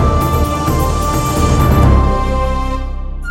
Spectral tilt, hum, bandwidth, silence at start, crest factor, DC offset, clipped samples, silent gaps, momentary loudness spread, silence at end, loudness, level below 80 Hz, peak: -6.5 dB/octave; none; 17 kHz; 0 s; 12 dB; under 0.1%; under 0.1%; none; 11 LU; 0 s; -14 LUFS; -16 dBFS; 0 dBFS